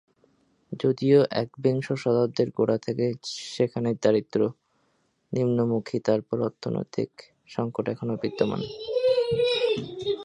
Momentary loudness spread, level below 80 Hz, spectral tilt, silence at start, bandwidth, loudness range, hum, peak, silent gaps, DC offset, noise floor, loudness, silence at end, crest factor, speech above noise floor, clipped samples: 9 LU; -64 dBFS; -6.5 dB/octave; 0.7 s; 10.5 kHz; 4 LU; none; -8 dBFS; none; under 0.1%; -70 dBFS; -26 LUFS; 0 s; 18 dB; 44 dB; under 0.1%